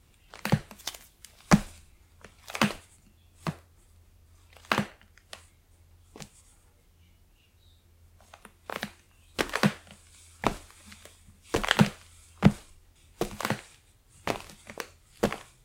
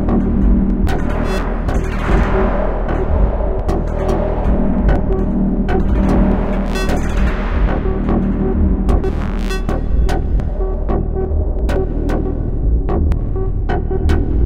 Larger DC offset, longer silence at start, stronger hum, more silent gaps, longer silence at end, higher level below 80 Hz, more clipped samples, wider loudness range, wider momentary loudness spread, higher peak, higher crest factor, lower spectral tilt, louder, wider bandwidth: neither; first, 0.45 s vs 0 s; neither; neither; first, 0.2 s vs 0 s; second, -50 dBFS vs -16 dBFS; neither; first, 9 LU vs 2 LU; first, 25 LU vs 5 LU; about the same, 0 dBFS vs -2 dBFS; first, 32 dB vs 12 dB; second, -5 dB/octave vs -8 dB/octave; second, -30 LUFS vs -18 LUFS; first, 17 kHz vs 8.4 kHz